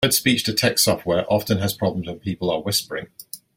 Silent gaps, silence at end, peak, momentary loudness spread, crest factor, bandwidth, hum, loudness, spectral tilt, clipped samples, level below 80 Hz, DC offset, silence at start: none; 0.2 s; -4 dBFS; 14 LU; 18 dB; 17 kHz; none; -21 LUFS; -3.5 dB/octave; under 0.1%; -52 dBFS; under 0.1%; 0 s